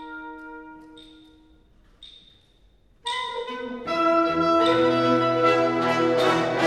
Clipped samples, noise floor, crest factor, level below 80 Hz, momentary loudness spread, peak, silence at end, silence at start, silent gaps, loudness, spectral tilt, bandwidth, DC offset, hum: under 0.1%; -58 dBFS; 16 dB; -58 dBFS; 18 LU; -8 dBFS; 0 s; 0 s; none; -22 LUFS; -5.5 dB/octave; 12 kHz; under 0.1%; none